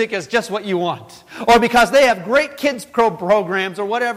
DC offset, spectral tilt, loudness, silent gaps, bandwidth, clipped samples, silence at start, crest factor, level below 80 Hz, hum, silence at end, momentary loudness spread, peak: under 0.1%; -4 dB/octave; -16 LUFS; none; 16 kHz; under 0.1%; 0 s; 12 dB; -46 dBFS; none; 0 s; 10 LU; -4 dBFS